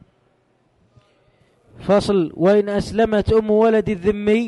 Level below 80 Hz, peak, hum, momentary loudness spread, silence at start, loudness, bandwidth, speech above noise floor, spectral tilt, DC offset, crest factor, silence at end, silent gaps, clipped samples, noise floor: -40 dBFS; -6 dBFS; none; 5 LU; 1.8 s; -18 LUFS; 11.5 kHz; 45 dB; -7 dB/octave; under 0.1%; 14 dB; 0 s; none; under 0.1%; -62 dBFS